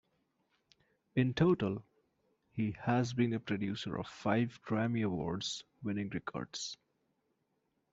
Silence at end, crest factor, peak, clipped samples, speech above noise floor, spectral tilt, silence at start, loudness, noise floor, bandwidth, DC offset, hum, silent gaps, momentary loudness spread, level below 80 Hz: 1.2 s; 20 dB; -16 dBFS; under 0.1%; 46 dB; -6 dB/octave; 1.15 s; -36 LUFS; -80 dBFS; 8 kHz; under 0.1%; none; none; 11 LU; -66 dBFS